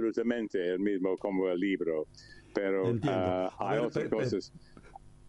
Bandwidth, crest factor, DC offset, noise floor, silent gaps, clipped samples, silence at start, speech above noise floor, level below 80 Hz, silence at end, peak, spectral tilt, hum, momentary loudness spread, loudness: 11 kHz; 16 dB; under 0.1%; -52 dBFS; none; under 0.1%; 0 s; 21 dB; -62 dBFS; 0 s; -16 dBFS; -7 dB/octave; none; 6 LU; -32 LUFS